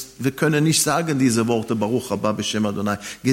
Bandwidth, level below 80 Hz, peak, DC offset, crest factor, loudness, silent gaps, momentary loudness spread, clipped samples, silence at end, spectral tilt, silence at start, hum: 16.5 kHz; -58 dBFS; -6 dBFS; under 0.1%; 16 dB; -21 LUFS; none; 7 LU; under 0.1%; 0 s; -4.5 dB/octave; 0 s; none